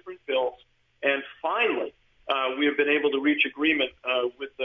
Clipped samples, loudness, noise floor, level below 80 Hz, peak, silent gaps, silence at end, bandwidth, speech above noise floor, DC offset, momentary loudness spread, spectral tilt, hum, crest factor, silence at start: under 0.1%; -25 LUFS; -55 dBFS; -70 dBFS; -10 dBFS; none; 0 s; 5.8 kHz; 30 dB; under 0.1%; 9 LU; -5.5 dB/octave; none; 18 dB; 0.05 s